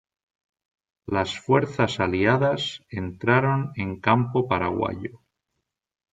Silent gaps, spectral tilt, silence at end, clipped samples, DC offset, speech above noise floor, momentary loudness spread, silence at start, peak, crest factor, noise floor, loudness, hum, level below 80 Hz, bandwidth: none; -6.5 dB/octave; 0.95 s; under 0.1%; under 0.1%; 57 dB; 11 LU; 1.1 s; -4 dBFS; 22 dB; -80 dBFS; -24 LUFS; none; -58 dBFS; 9 kHz